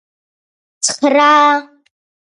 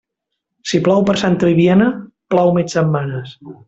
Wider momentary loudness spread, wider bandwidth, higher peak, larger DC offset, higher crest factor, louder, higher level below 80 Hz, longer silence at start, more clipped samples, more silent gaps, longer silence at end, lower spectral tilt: second, 10 LU vs 16 LU; first, 11.5 kHz vs 8 kHz; about the same, 0 dBFS vs -2 dBFS; neither; about the same, 16 dB vs 14 dB; first, -12 LUFS vs -15 LUFS; second, -70 dBFS vs -52 dBFS; first, 0.8 s vs 0.65 s; neither; neither; first, 0.7 s vs 0.15 s; second, -0.5 dB/octave vs -6.5 dB/octave